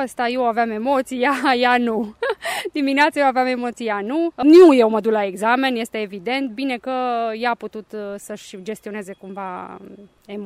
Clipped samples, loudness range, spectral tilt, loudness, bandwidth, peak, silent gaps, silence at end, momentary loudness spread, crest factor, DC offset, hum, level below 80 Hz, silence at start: under 0.1%; 11 LU; -4.5 dB/octave; -18 LUFS; 15 kHz; -2 dBFS; none; 0 s; 16 LU; 16 dB; under 0.1%; none; -62 dBFS; 0 s